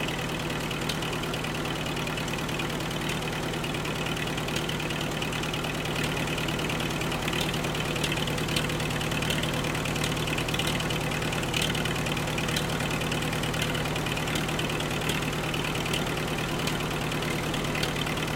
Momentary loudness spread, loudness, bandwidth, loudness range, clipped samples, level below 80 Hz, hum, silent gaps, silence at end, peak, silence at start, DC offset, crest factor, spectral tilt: 3 LU; -28 LUFS; 17 kHz; 2 LU; under 0.1%; -44 dBFS; none; none; 0 s; -10 dBFS; 0 s; under 0.1%; 18 dB; -4 dB/octave